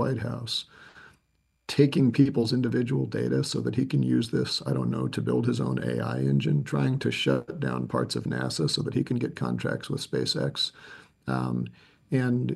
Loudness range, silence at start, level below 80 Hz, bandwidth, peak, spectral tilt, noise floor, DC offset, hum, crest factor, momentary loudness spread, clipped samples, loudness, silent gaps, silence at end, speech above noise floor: 4 LU; 0 s; -60 dBFS; 12.5 kHz; -8 dBFS; -6 dB/octave; -71 dBFS; under 0.1%; none; 20 dB; 8 LU; under 0.1%; -27 LUFS; none; 0 s; 45 dB